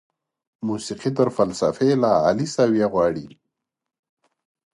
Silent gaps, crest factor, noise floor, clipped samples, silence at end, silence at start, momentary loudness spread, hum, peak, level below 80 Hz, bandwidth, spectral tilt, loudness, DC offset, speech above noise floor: none; 18 dB; -84 dBFS; under 0.1%; 1.45 s; 0.6 s; 10 LU; none; -4 dBFS; -58 dBFS; 11.5 kHz; -6 dB/octave; -21 LUFS; under 0.1%; 64 dB